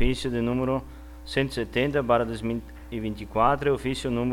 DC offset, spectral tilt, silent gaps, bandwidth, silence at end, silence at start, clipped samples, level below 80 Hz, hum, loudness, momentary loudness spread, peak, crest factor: under 0.1%; -6 dB/octave; none; 16.5 kHz; 0 s; 0 s; under 0.1%; -38 dBFS; none; -26 LUFS; 11 LU; -8 dBFS; 18 dB